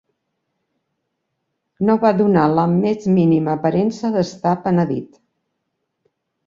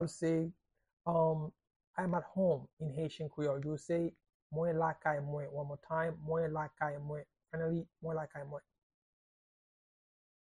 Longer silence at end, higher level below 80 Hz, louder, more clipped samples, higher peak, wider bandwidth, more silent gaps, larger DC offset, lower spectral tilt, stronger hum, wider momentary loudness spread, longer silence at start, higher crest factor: second, 1.4 s vs 1.9 s; first, -56 dBFS vs -70 dBFS; first, -17 LUFS vs -38 LUFS; neither; first, -2 dBFS vs -20 dBFS; second, 7.6 kHz vs 10.5 kHz; second, none vs 0.93-0.97 s, 1.76-1.80 s, 1.87-1.94 s, 2.73-2.77 s, 4.34-4.50 s; neither; about the same, -8.5 dB/octave vs -7.5 dB/octave; neither; second, 6 LU vs 11 LU; first, 1.8 s vs 0 s; about the same, 16 dB vs 20 dB